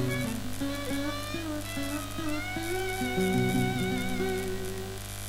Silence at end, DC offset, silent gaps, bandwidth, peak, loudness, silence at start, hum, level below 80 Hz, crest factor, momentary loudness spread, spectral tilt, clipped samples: 0 s; under 0.1%; none; 16 kHz; -16 dBFS; -31 LUFS; 0 s; 50 Hz at -40 dBFS; -44 dBFS; 14 dB; 7 LU; -5 dB/octave; under 0.1%